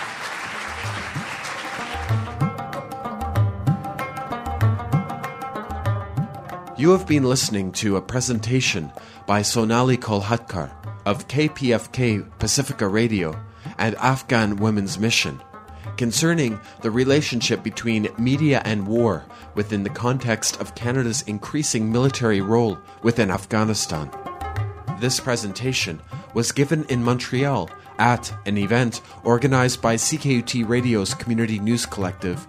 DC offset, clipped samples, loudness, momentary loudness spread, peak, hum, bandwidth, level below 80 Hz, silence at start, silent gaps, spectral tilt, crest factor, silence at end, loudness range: under 0.1%; under 0.1%; -22 LUFS; 10 LU; 0 dBFS; none; 15.5 kHz; -46 dBFS; 0 s; none; -5 dB/octave; 22 dB; 0.05 s; 4 LU